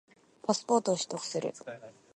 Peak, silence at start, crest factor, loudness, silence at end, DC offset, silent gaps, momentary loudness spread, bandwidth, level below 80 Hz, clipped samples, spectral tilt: -12 dBFS; 0.45 s; 22 dB; -32 LUFS; 0.25 s; under 0.1%; none; 17 LU; 11.5 kHz; -82 dBFS; under 0.1%; -4 dB/octave